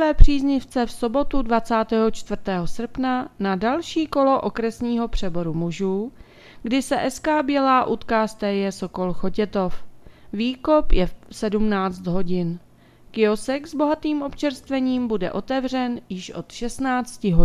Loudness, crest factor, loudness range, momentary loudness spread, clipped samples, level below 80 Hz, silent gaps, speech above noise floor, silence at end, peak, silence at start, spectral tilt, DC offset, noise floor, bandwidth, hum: -23 LUFS; 20 dB; 2 LU; 9 LU; under 0.1%; -30 dBFS; none; 29 dB; 0 s; 0 dBFS; 0 s; -6 dB/octave; under 0.1%; -49 dBFS; 12 kHz; none